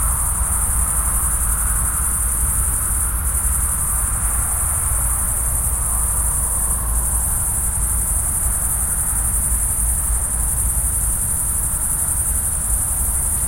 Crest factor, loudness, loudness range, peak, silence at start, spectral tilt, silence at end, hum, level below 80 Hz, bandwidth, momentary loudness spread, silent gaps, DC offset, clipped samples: 14 dB; -17 LUFS; 0 LU; -4 dBFS; 0 s; -3 dB/octave; 0 s; none; -24 dBFS; 16.5 kHz; 1 LU; none; under 0.1%; under 0.1%